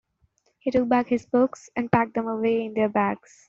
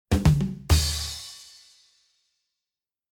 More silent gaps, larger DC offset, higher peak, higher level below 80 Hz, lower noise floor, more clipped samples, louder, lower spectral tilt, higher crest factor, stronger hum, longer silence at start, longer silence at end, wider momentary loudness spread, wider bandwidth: neither; neither; about the same, -4 dBFS vs -6 dBFS; second, -60 dBFS vs -34 dBFS; second, -68 dBFS vs under -90 dBFS; neither; about the same, -24 LUFS vs -24 LUFS; first, -7 dB/octave vs -5 dB/octave; about the same, 20 dB vs 20 dB; neither; first, 0.65 s vs 0.1 s; second, 0.35 s vs 1.7 s; second, 5 LU vs 18 LU; second, 7.8 kHz vs 19.5 kHz